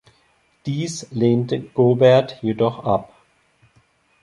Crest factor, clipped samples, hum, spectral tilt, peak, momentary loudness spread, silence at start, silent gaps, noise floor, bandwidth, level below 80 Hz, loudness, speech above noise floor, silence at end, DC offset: 18 dB; under 0.1%; none; -6.5 dB/octave; -2 dBFS; 12 LU; 0.65 s; none; -61 dBFS; 11.5 kHz; -58 dBFS; -19 LUFS; 43 dB; 1.15 s; under 0.1%